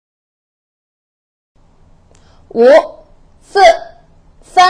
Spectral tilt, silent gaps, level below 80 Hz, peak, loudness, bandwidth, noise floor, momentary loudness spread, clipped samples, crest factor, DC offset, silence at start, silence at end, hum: -2.5 dB/octave; none; -46 dBFS; 0 dBFS; -10 LUFS; 11 kHz; -46 dBFS; 14 LU; under 0.1%; 14 dB; under 0.1%; 2.55 s; 0 s; none